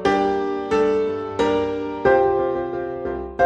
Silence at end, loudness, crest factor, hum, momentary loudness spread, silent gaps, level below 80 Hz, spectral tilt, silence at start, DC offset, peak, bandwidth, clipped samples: 0 s; -21 LUFS; 16 dB; none; 9 LU; none; -46 dBFS; -6 dB/octave; 0 s; under 0.1%; -4 dBFS; 8.6 kHz; under 0.1%